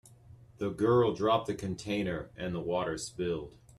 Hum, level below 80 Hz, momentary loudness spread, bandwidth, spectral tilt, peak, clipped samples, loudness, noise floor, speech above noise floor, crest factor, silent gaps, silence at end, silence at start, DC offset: none; -58 dBFS; 11 LU; 12.5 kHz; -6 dB/octave; -14 dBFS; under 0.1%; -32 LUFS; -55 dBFS; 24 dB; 18 dB; none; 0.3 s; 0.1 s; under 0.1%